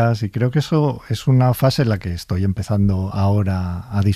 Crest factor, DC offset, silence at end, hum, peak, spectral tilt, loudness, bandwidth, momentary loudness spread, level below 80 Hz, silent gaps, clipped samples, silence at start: 14 dB; under 0.1%; 0 s; none; -4 dBFS; -7.5 dB/octave; -19 LUFS; 14.5 kHz; 7 LU; -40 dBFS; none; under 0.1%; 0 s